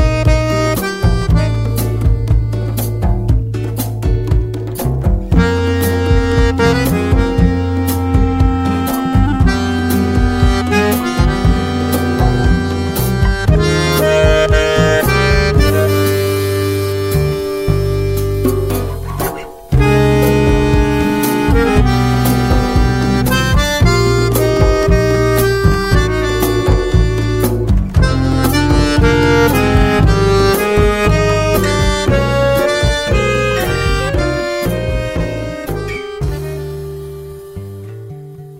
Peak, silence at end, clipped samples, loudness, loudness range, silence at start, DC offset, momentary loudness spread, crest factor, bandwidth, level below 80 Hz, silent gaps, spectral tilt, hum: 0 dBFS; 0 s; under 0.1%; -14 LUFS; 5 LU; 0 s; under 0.1%; 8 LU; 12 dB; 16.5 kHz; -18 dBFS; none; -6 dB/octave; none